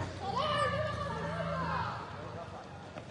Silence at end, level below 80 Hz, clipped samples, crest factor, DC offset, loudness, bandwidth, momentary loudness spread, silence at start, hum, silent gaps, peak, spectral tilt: 0 s; -58 dBFS; under 0.1%; 18 dB; under 0.1%; -35 LUFS; 11 kHz; 15 LU; 0 s; none; none; -20 dBFS; -5.5 dB/octave